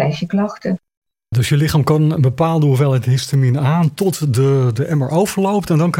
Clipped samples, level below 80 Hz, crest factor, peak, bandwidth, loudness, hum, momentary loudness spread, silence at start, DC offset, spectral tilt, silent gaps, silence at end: under 0.1%; -46 dBFS; 12 dB; -2 dBFS; 16.5 kHz; -16 LUFS; none; 5 LU; 0 s; under 0.1%; -7 dB/octave; 0.97-1.02 s; 0 s